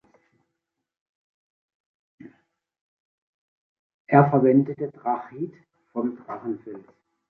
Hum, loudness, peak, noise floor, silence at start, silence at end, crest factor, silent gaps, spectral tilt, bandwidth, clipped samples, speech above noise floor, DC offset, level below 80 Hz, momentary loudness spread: none; -23 LUFS; -2 dBFS; -82 dBFS; 2.25 s; 0.5 s; 24 dB; 2.81-4.05 s; -12 dB/octave; 2.8 kHz; under 0.1%; 60 dB; under 0.1%; -68 dBFS; 18 LU